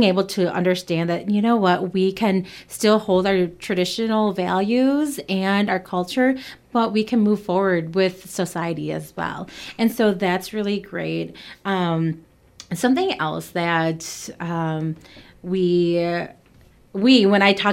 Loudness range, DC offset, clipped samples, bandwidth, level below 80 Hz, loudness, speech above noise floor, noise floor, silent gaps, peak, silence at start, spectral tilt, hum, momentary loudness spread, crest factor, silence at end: 4 LU; under 0.1%; under 0.1%; 16.5 kHz; -58 dBFS; -21 LUFS; 31 dB; -52 dBFS; none; -2 dBFS; 0 s; -5.5 dB/octave; none; 11 LU; 18 dB; 0 s